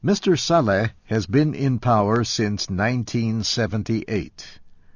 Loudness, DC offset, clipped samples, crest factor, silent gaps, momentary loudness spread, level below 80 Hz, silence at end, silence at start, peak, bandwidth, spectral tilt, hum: -21 LUFS; under 0.1%; under 0.1%; 16 dB; none; 9 LU; -46 dBFS; 0.2 s; 0.05 s; -6 dBFS; 7.4 kHz; -5.5 dB/octave; none